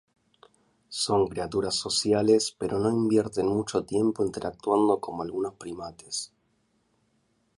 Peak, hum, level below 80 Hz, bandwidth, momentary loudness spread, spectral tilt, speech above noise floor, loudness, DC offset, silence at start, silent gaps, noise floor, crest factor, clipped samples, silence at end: -10 dBFS; none; -58 dBFS; 11.5 kHz; 11 LU; -4.5 dB/octave; 44 dB; -27 LUFS; under 0.1%; 0.9 s; none; -71 dBFS; 18 dB; under 0.1%; 1.3 s